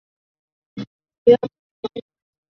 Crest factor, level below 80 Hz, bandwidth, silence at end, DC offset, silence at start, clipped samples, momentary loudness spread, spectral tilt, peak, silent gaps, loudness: 22 dB; -62 dBFS; 6 kHz; 0.5 s; under 0.1%; 0.75 s; under 0.1%; 22 LU; -8 dB/octave; -2 dBFS; 0.87-0.99 s, 1.18-1.26 s, 1.59-1.83 s; -17 LUFS